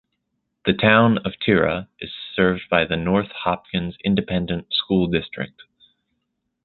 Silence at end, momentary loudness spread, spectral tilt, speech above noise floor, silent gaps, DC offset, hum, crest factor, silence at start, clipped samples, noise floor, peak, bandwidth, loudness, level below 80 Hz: 1.15 s; 13 LU; -11 dB/octave; 55 dB; none; under 0.1%; none; 20 dB; 0.65 s; under 0.1%; -76 dBFS; -2 dBFS; 4.4 kHz; -21 LUFS; -46 dBFS